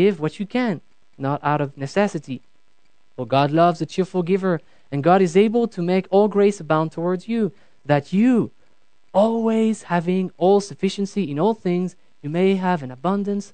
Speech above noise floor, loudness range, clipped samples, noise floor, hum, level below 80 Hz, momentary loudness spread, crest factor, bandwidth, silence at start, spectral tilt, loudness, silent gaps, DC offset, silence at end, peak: 47 dB; 3 LU; under 0.1%; -66 dBFS; none; -68 dBFS; 10 LU; 18 dB; 9.2 kHz; 0 s; -7 dB/octave; -21 LUFS; none; 0.4%; 0.1 s; -2 dBFS